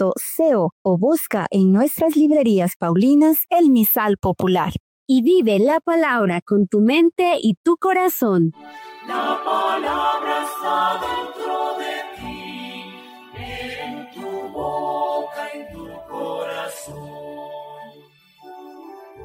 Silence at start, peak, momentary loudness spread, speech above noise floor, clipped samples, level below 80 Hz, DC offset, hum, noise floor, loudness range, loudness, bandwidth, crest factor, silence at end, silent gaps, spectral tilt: 0 s; -8 dBFS; 19 LU; 33 dB; under 0.1%; -54 dBFS; under 0.1%; none; -50 dBFS; 13 LU; -19 LUFS; 17 kHz; 12 dB; 0 s; 0.72-0.85 s, 2.76-2.80 s, 4.80-5.06 s, 6.42-6.46 s, 7.57-7.64 s; -6 dB/octave